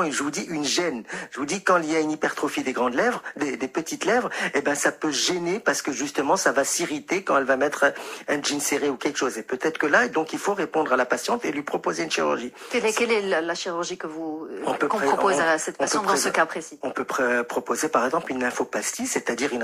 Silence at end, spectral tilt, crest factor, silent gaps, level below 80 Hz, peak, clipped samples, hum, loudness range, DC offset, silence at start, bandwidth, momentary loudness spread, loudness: 0 s; -2.5 dB/octave; 20 dB; none; -68 dBFS; -6 dBFS; under 0.1%; none; 2 LU; under 0.1%; 0 s; 15.5 kHz; 8 LU; -24 LUFS